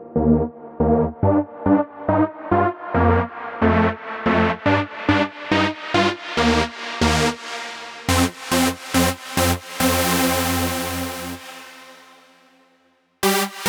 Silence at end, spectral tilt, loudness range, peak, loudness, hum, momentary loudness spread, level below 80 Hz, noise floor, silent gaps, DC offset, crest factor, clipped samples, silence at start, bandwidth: 0 s; -4.5 dB/octave; 3 LU; -2 dBFS; -20 LUFS; none; 10 LU; -38 dBFS; -61 dBFS; none; under 0.1%; 18 dB; under 0.1%; 0 s; over 20 kHz